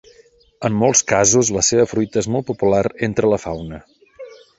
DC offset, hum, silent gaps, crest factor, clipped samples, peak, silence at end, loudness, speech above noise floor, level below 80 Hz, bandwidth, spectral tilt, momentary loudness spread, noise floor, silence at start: under 0.1%; none; none; 18 dB; under 0.1%; -2 dBFS; 0.25 s; -17 LUFS; 34 dB; -46 dBFS; 8.2 kHz; -4 dB/octave; 13 LU; -51 dBFS; 0.6 s